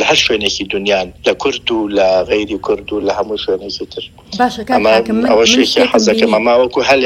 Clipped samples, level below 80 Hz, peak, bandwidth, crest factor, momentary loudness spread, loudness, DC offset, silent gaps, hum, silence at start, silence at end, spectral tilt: under 0.1%; -42 dBFS; 0 dBFS; 16.5 kHz; 14 dB; 8 LU; -13 LUFS; under 0.1%; none; none; 0 s; 0 s; -3 dB/octave